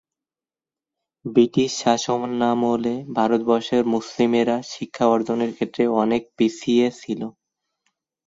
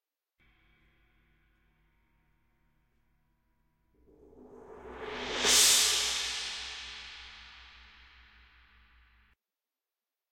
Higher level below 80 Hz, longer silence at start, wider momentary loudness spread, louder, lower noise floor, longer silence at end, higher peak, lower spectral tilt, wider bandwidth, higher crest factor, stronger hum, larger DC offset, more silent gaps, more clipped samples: about the same, -64 dBFS vs -62 dBFS; second, 1.25 s vs 4.35 s; second, 7 LU vs 28 LU; first, -21 LUFS vs -26 LUFS; about the same, under -90 dBFS vs under -90 dBFS; second, 0.95 s vs 2.65 s; first, -4 dBFS vs -10 dBFS; first, -5 dB/octave vs 1.5 dB/octave; second, 7.8 kHz vs 16.5 kHz; second, 18 dB vs 26 dB; neither; neither; neither; neither